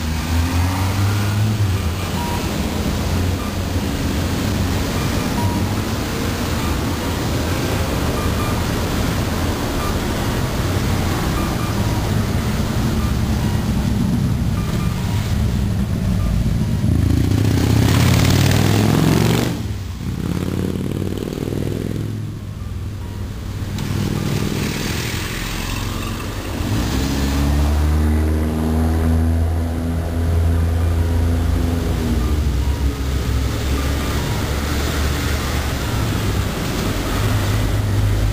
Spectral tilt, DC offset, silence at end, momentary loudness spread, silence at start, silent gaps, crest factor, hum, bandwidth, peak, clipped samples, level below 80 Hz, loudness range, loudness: -5.5 dB/octave; 0.4%; 0 s; 7 LU; 0 s; none; 14 dB; none; 16 kHz; -6 dBFS; under 0.1%; -24 dBFS; 6 LU; -20 LUFS